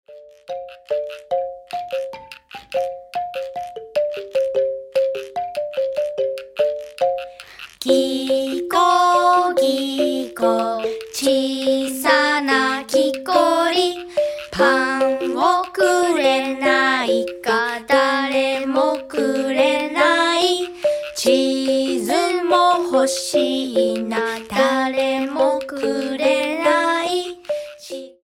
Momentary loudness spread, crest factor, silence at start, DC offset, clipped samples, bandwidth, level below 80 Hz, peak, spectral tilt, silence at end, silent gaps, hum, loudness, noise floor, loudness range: 11 LU; 18 dB; 0.1 s; under 0.1%; under 0.1%; 16.5 kHz; -60 dBFS; -2 dBFS; -2.5 dB/octave; 0.15 s; none; none; -19 LUFS; -40 dBFS; 6 LU